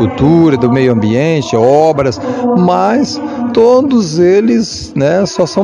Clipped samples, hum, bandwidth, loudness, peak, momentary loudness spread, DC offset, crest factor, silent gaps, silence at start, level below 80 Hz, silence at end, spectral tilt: 0.9%; none; 10.5 kHz; -10 LUFS; 0 dBFS; 6 LU; under 0.1%; 10 dB; none; 0 s; -42 dBFS; 0 s; -6.5 dB/octave